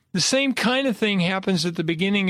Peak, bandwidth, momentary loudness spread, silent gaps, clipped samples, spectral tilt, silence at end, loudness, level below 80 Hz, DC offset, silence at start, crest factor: -8 dBFS; 14.5 kHz; 4 LU; none; under 0.1%; -4 dB/octave; 0 s; -21 LUFS; -62 dBFS; under 0.1%; 0.15 s; 14 dB